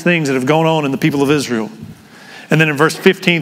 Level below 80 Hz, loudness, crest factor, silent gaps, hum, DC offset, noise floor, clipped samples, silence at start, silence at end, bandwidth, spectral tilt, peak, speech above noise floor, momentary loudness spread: -58 dBFS; -14 LUFS; 14 dB; none; none; under 0.1%; -37 dBFS; under 0.1%; 0 s; 0 s; 16 kHz; -5.5 dB/octave; 0 dBFS; 24 dB; 9 LU